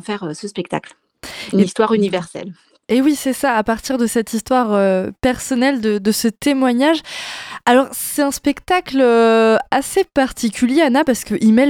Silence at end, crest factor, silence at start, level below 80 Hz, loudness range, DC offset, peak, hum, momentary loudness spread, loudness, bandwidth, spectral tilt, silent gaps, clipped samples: 0 s; 14 dB; 0.1 s; -46 dBFS; 3 LU; under 0.1%; -2 dBFS; none; 12 LU; -16 LUFS; 17.5 kHz; -4.5 dB/octave; none; under 0.1%